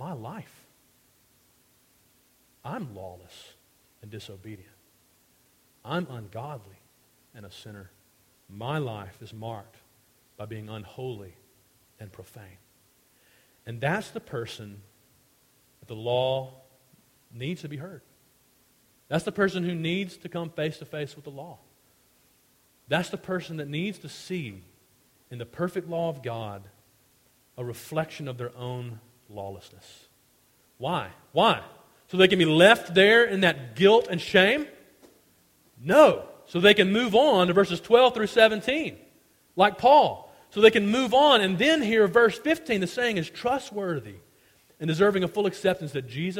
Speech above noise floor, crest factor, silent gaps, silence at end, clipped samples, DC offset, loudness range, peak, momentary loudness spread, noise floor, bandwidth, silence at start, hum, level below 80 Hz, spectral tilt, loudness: 39 dB; 24 dB; none; 0 s; under 0.1%; under 0.1%; 21 LU; -2 dBFS; 24 LU; -64 dBFS; 16.5 kHz; 0 s; none; -64 dBFS; -5 dB/octave; -24 LUFS